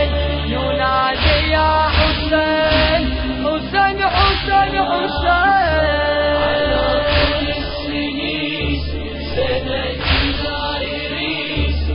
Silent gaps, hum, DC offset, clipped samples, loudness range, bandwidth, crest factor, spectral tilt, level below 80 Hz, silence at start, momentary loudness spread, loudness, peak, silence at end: none; none; under 0.1%; under 0.1%; 4 LU; 5.4 kHz; 14 dB; -10 dB/octave; -24 dBFS; 0 s; 7 LU; -17 LUFS; -2 dBFS; 0 s